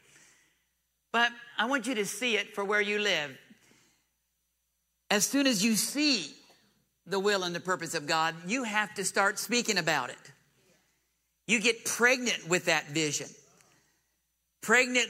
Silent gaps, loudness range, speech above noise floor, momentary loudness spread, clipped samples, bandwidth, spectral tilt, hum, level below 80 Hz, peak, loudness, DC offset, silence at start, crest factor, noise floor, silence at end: none; 2 LU; 50 dB; 8 LU; under 0.1%; 16 kHz; -2 dB/octave; none; -76 dBFS; -10 dBFS; -28 LUFS; under 0.1%; 1.15 s; 22 dB; -79 dBFS; 0 s